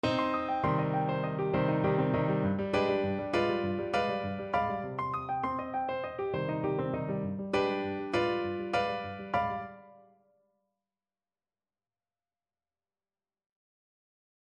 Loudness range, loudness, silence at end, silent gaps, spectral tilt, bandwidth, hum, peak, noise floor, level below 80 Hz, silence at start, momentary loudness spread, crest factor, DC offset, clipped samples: 7 LU; -32 LUFS; 4.5 s; none; -7.5 dB/octave; 9.8 kHz; none; -16 dBFS; under -90 dBFS; -58 dBFS; 0.05 s; 6 LU; 18 dB; under 0.1%; under 0.1%